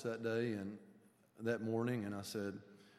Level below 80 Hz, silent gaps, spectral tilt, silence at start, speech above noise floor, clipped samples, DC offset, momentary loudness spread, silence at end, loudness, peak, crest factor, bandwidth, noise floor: -86 dBFS; none; -6.5 dB/octave; 0 s; 26 dB; under 0.1%; under 0.1%; 11 LU; 0.1 s; -41 LUFS; -24 dBFS; 18 dB; 14.5 kHz; -66 dBFS